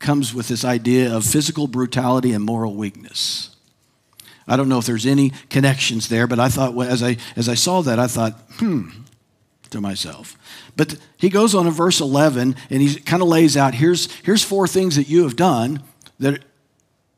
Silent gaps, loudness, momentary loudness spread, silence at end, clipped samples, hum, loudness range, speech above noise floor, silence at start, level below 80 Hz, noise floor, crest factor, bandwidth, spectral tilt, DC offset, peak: none; -18 LUFS; 10 LU; 0.8 s; under 0.1%; none; 6 LU; 46 dB; 0 s; -58 dBFS; -64 dBFS; 18 dB; 16 kHz; -5 dB/octave; under 0.1%; -2 dBFS